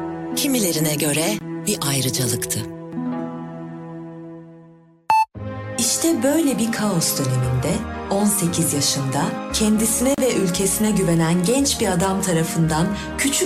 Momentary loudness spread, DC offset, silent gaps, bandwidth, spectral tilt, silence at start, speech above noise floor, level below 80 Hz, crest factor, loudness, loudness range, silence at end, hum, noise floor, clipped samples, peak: 12 LU; under 0.1%; none; 16 kHz; -4 dB/octave; 0 s; 28 dB; -42 dBFS; 14 dB; -20 LUFS; 7 LU; 0 s; none; -48 dBFS; under 0.1%; -6 dBFS